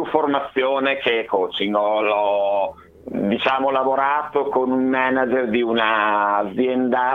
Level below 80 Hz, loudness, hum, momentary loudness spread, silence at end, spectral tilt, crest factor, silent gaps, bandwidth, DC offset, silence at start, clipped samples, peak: -60 dBFS; -20 LUFS; none; 3 LU; 0 s; -7 dB/octave; 18 dB; none; 6 kHz; under 0.1%; 0 s; under 0.1%; -2 dBFS